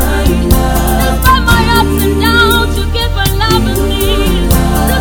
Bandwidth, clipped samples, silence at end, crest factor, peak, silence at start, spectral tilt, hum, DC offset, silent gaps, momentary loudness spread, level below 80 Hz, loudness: over 20 kHz; 0.9%; 0 s; 10 dB; 0 dBFS; 0 s; -5 dB/octave; none; under 0.1%; none; 5 LU; -14 dBFS; -10 LUFS